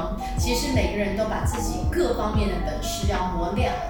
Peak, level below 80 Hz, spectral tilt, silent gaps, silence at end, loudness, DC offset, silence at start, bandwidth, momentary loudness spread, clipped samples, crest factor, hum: -10 dBFS; -30 dBFS; -5 dB/octave; none; 0 s; -25 LUFS; under 0.1%; 0 s; 18 kHz; 4 LU; under 0.1%; 14 dB; none